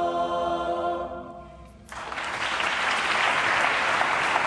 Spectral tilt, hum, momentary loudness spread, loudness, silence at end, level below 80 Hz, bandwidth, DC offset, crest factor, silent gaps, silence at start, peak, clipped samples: -2.5 dB/octave; none; 16 LU; -24 LUFS; 0 s; -54 dBFS; 11 kHz; under 0.1%; 18 dB; none; 0 s; -8 dBFS; under 0.1%